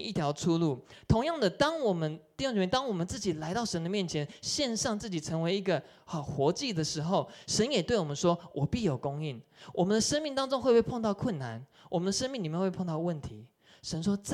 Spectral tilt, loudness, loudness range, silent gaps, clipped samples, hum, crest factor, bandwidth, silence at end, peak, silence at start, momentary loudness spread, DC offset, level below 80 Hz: -5 dB/octave; -31 LUFS; 2 LU; none; under 0.1%; none; 20 dB; 13.5 kHz; 0 s; -10 dBFS; 0 s; 9 LU; under 0.1%; -54 dBFS